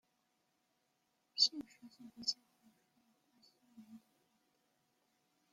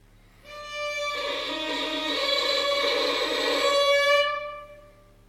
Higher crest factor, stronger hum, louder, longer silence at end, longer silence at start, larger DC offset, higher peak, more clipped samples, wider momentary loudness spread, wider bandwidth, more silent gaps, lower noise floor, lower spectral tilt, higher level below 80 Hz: first, 30 dB vs 16 dB; neither; second, -36 LUFS vs -24 LUFS; first, 1.55 s vs 0.4 s; first, 1.35 s vs 0.45 s; neither; second, -18 dBFS vs -10 dBFS; neither; first, 25 LU vs 15 LU; about the same, 16.5 kHz vs 15.5 kHz; neither; first, -82 dBFS vs -52 dBFS; about the same, 0 dB/octave vs -1 dB/octave; second, -90 dBFS vs -58 dBFS